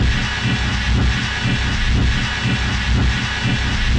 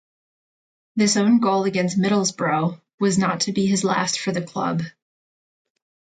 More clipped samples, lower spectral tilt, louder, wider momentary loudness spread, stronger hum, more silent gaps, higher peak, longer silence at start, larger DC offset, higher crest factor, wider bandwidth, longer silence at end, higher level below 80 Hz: neither; about the same, -4.5 dB/octave vs -4.5 dB/octave; first, -18 LUFS vs -21 LUFS; second, 1 LU vs 8 LU; neither; second, none vs 2.94-2.98 s; about the same, -8 dBFS vs -6 dBFS; second, 0 s vs 0.95 s; neither; second, 10 dB vs 16 dB; about the same, 9.6 kHz vs 9.4 kHz; second, 0 s vs 1.3 s; first, -22 dBFS vs -64 dBFS